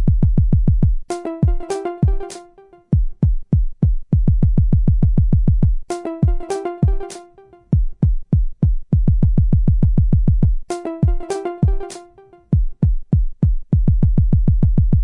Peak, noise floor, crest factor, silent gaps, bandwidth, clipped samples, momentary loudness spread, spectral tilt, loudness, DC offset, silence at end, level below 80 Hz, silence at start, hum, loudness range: -4 dBFS; -46 dBFS; 12 dB; none; 11 kHz; under 0.1%; 9 LU; -9 dB/octave; -19 LUFS; under 0.1%; 0 s; -18 dBFS; 0 s; none; 3 LU